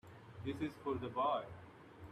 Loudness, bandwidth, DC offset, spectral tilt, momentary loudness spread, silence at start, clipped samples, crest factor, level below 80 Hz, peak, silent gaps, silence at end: -41 LUFS; 14.5 kHz; under 0.1%; -7.5 dB/octave; 19 LU; 0.05 s; under 0.1%; 18 dB; -70 dBFS; -26 dBFS; none; 0 s